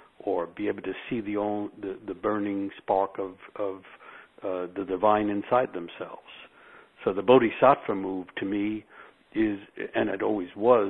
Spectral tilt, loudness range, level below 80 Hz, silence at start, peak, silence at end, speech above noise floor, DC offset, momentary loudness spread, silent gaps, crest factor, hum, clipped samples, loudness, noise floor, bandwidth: -9 dB/octave; 6 LU; -62 dBFS; 0.25 s; -4 dBFS; 0 s; 27 dB; under 0.1%; 17 LU; none; 24 dB; none; under 0.1%; -28 LUFS; -54 dBFS; 4.1 kHz